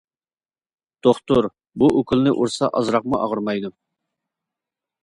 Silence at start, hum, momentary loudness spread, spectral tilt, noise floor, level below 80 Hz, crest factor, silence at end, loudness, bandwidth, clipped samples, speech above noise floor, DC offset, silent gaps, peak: 1.05 s; none; 8 LU; -6.5 dB/octave; under -90 dBFS; -52 dBFS; 20 dB; 1.35 s; -20 LUFS; 11.5 kHz; under 0.1%; over 71 dB; under 0.1%; none; -2 dBFS